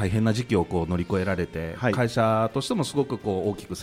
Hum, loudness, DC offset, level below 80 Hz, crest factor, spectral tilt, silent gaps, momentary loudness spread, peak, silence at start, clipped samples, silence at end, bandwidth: none; -25 LUFS; under 0.1%; -48 dBFS; 16 dB; -6.5 dB/octave; none; 5 LU; -10 dBFS; 0 s; under 0.1%; 0 s; 15.5 kHz